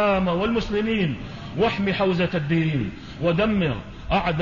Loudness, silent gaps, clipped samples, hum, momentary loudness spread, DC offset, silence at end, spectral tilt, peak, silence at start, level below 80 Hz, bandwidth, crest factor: -23 LUFS; none; under 0.1%; none; 7 LU; 0.3%; 0 s; -7.5 dB/octave; -8 dBFS; 0 s; -40 dBFS; 7.4 kHz; 14 dB